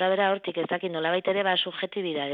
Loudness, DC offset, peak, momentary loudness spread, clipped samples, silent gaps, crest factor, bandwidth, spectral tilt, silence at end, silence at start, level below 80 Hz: -27 LUFS; under 0.1%; -10 dBFS; 6 LU; under 0.1%; none; 16 dB; 5 kHz; -8 dB/octave; 0 s; 0 s; -82 dBFS